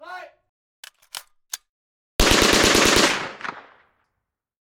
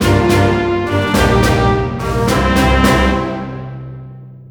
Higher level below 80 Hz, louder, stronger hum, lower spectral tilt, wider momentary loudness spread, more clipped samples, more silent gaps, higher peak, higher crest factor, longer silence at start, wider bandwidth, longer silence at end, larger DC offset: second, -36 dBFS vs -24 dBFS; second, -17 LUFS vs -13 LUFS; neither; second, -2 dB/octave vs -6 dB/octave; first, 23 LU vs 17 LU; neither; first, 0.49-0.83 s, 1.69-2.19 s vs none; about the same, -2 dBFS vs 0 dBFS; first, 20 dB vs 14 dB; about the same, 0.05 s vs 0 s; second, 18 kHz vs over 20 kHz; first, 1.2 s vs 0.05 s; neither